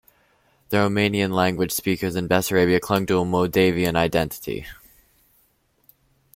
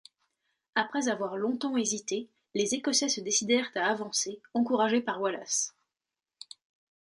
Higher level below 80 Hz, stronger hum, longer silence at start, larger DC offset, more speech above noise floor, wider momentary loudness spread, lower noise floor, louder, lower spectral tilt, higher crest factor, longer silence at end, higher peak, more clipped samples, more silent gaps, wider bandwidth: first, -50 dBFS vs -80 dBFS; neither; about the same, 0.7 s vs 0.75 s; neither; second, 43 dB vs over 61 dB; about the same, 8 LU vs 9 LU; second, -64 dBFS vs under -90 dBFS; first, -21 LUFS vs -29 LUFS; first, -5 dB/octave vs -2 dB/octave; about the same, 20 dB vs 18 dB; first, 1.65 s vs 1.3 s; first, -4 dBFS vs -12 dBFS; neither; neither; first, 16.5 kHz vs 11.5 kHz